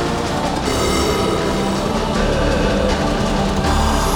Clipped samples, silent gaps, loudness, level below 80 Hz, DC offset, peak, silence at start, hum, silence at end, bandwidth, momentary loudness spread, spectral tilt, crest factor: under 0.1%; none; -18 LUFS; -24 dBFS; under 0.1%; -4 dBFS; 0 s; none; 0 s; over 20 kHz; 3 LU; -5 dB/octave; 14 dB